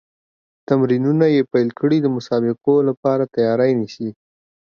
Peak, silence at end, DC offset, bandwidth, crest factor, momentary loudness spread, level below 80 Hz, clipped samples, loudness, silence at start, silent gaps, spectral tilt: -2 dBFS; 0.6 s; under 0.1%; 7 kHz; 16 dB; 6 LU; -66 dBFS; under 0.1%; -18 LUFS; 0.7 s; 2.97-3.03 s; -8.5 dB/octave